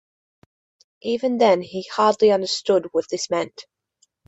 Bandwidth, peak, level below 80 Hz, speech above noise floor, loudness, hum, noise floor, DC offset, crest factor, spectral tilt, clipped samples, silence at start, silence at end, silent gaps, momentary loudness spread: 8.4 kHz; -4 dBFS; -68 dBFS; 46 dB; -20 LUFS; none; -66 dBFS; under 0.1%; 18 dB; -4 dB/octave; under 0.1%; 1.05 s; 0.65 s; none; 10 LU